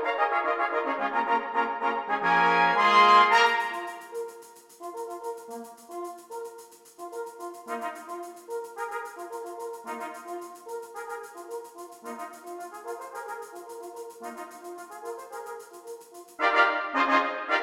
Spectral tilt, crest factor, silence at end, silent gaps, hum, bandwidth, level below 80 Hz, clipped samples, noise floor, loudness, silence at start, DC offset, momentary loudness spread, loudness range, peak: -3 dB/octave; 22 dB; 0 s; none; none; 16.5 kHz; -80 dBFS; under 0.1%; -49 dBFS; -25 LUFS; 0 s; under 0.1%; 20 LU; 18 LU; -6 dBFS